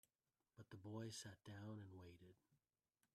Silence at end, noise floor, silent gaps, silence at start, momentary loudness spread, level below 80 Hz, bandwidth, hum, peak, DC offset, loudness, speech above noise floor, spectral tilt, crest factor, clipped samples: 0.6 s; under -90 dBFS; none; 0.55 s; 13 LU; -88 dBFS; 13.5 kHz; none; -40 dBFS; under 0.1%; -57 LUFS; over 33 dB; -5 dB/octave; 20 dB; under 0.1%